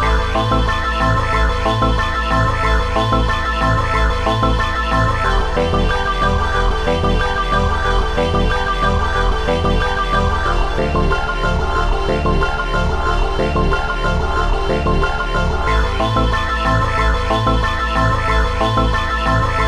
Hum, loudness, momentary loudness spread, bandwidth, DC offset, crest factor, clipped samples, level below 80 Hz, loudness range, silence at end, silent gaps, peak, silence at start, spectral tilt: none; -17 LUFS; 2 LU; 11.5 kHz; under 0.1%; 14 dB; under 0.1%; -20 dBFS; 2 LU; 0 s; none; -2 dBFS; 0 s; -6 dB/octave